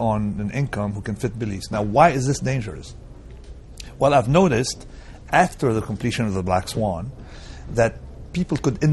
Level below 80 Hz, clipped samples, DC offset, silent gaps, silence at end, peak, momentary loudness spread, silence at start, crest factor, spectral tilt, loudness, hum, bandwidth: -40 dBFS; under 0.1%; under 0.1%; none; 0 s; -2 dBFS; 23 LU; 0 s; 20 dB; -6 dB/octave; -22 LUFS; none; 12 kHz